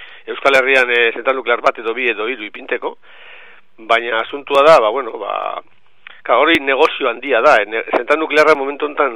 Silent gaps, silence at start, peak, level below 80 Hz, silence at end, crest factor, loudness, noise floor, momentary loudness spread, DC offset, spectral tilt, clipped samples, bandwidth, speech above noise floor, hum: none; 0 s; 0 dBFS; -58 dBFS; 0 s; 16 dB; -14 LUFS; -42 dBFS; 12 LU; 0.9%; -3 dB/octave; under 0.1%; 15 kHz; 28 dB; none